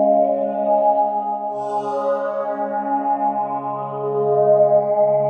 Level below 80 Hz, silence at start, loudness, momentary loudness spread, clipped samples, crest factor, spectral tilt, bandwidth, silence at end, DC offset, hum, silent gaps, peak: -78 dBFS; 0 s; -19 LUFS; 9 LU; under 0.1%; 14 dB; -9 dB/octave; 4.5 kHz; 0 s; under 0.1%; none; none; -4 dBFS